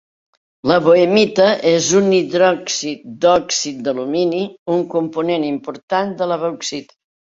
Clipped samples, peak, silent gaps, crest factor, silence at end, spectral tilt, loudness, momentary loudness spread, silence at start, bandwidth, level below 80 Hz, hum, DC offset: under 0.1%; -2 dBFS; 4.59-4.66 s, 5.83-5.88 s; 16 dB; 0.4 s; -4 dB/octave; -16 LUFS; 10 LU; 0.65 s; 7.8 kHz; -58 dBFS; none; under 0.1%